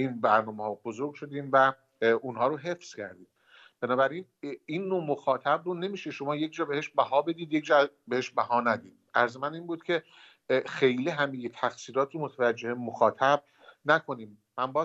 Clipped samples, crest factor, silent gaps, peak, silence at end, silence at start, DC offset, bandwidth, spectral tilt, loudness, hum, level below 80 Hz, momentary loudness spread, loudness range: under 0.1%; 22 dB; none; -8 dBFS; 0 s; 0 s; under 0.1%; 8 kHz; -5.5 dB/octave; -29 LUFS; none; -82 dBFS; 12 LU; 3 LU